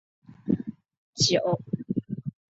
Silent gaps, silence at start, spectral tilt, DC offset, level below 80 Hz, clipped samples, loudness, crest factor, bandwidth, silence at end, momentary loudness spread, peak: 0.97-1.13 s; 0.3 s; -4.5 dB/octave; under 0.1%; -60 dBFS; under 0.1%; -27 LUFS; 20 dB; 8.2 kHz; 0.2 s; 18 LU; -8 dBFS